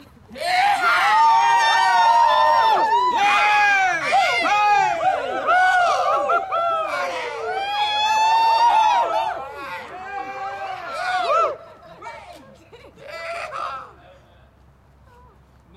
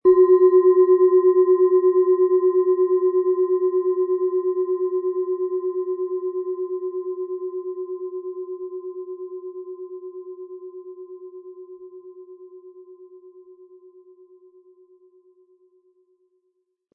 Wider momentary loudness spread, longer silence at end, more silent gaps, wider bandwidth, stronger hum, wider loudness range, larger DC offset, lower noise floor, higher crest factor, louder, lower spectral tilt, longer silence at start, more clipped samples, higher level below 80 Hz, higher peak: second, 16 LU vs 24 LU; second, 1.85 s vs 3.55 s; neither; first, 14 kHz vs 2 kHz; neither; second, 16 LU vs 23 LU; neither; second, -52 dBFS vs -73 dBFS; about the same, 12 dB vs 16 dB; about the same, -18 LUFS vs -20 LUFS; second, -1.5 dB/octave vs -11 dB/octave; first, 0.3 s vs 0.05 s; neither; first, -58 dBFS vs -72 dBFS; about the same, -8 dBFS vs -6 dBFS